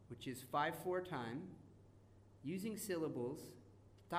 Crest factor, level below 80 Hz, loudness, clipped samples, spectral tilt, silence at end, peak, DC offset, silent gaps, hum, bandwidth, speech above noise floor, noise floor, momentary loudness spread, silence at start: 20 dB; -74 dBFS; -44 LUFS; under 0.1%; -5 dB/octave; 0 s; -26 dBFS; under 0.1%; none; none; 15.5 kHz; 21 dB; -65 dBFS; 21 LU; 0 s